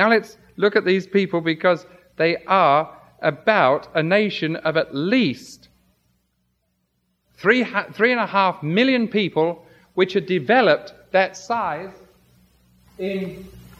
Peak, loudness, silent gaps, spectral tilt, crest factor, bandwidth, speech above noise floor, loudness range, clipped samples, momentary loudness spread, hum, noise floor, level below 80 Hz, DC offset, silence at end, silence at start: -2 dBFS; -20 LUFS; none; -6 dB/octave; 20 dB; 13.5 kHz; 51 dB; 4 LU; under 0.1%; 11 LU; none; -70 dBFS; -62 dBFS; under 0.1%; 0.2 s; 0 s